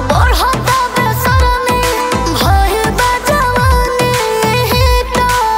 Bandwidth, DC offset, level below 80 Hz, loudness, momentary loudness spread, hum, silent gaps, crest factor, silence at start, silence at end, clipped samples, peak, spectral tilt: 16.5 kHz; under 0.1%; -18 dBFS; -12 LUFS; 2 LU; none; none; 12 dB; 0 s; 0 s; under 0.1%; 0 dBFS; -4.5 dB/octave